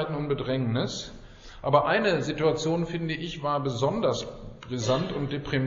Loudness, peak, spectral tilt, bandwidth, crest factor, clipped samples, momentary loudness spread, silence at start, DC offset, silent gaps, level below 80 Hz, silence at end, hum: -27 LUFS; -8 dBFS; -5 dB/octave; 7.6 kHz; 20 dB; under 0.1%; 11 LU; 0 s; under 0.1%; none; -50 dBFS; 0 s; none